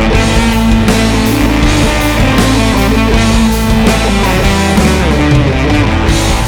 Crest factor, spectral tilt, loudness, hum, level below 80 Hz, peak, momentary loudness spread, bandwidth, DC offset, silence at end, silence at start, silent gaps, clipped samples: 8 dB; -5 dB/octave; -10 LUFS; none; -14 dBFS; 0 dBFS; 1 LU; over 20 kHz; under 0.1%; 0 s; 0 s; none; under 0.1%